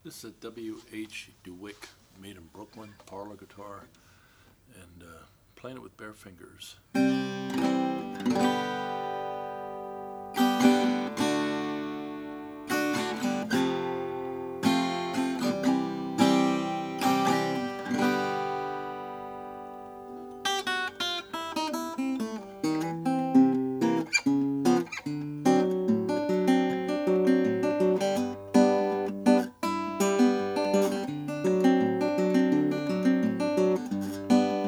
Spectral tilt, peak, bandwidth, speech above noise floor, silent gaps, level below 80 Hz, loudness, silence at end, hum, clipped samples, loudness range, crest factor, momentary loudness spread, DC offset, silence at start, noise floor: -5 dB/octave; -8 dBFS; 16 kHz; 25 dB; none; -68 dBFS; -27 LUFS; 0 s; none; under 0.1%; 18 LU; 20 dB; 20 LU; under 0.1%; 0.05 s; -59 dBFS